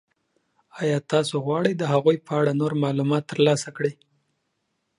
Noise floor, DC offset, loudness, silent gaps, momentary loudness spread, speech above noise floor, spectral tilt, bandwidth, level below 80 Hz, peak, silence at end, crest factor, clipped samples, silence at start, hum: -75 dBFS; under 0.1%; -23 LUFS; none; 6 LU; 53 dB; -6 dB/octave; 11.5 kHz; -70 dBFS; -6 dBFS; 1.05 s; 18 dB; under 0.1%; 0.75 s; none